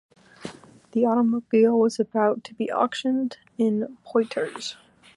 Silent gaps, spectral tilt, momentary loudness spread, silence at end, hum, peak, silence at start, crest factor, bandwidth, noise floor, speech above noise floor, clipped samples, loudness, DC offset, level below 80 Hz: none; -5.5 dB/octave; 15 LU; 0.45 s; none; -8 dBFS; 0.4 s; 16 dB; 11 kHz; -42 dBFS; 19 dB; under 0.1%; -24 LUFS; under 0.1%; -74 dBFS